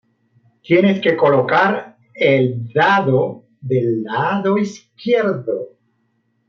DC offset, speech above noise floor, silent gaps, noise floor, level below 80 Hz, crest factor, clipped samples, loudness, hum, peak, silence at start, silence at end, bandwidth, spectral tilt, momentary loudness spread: under 0.1%; 49 dB; none; -65 dBFS; -64 dBFS; 14 dB; under 0.1%; -17 LUFS; none; -2 dBFS; 0.7 s; 0.8 s; 7.4 kHz; -7 dB/octave; 12 LU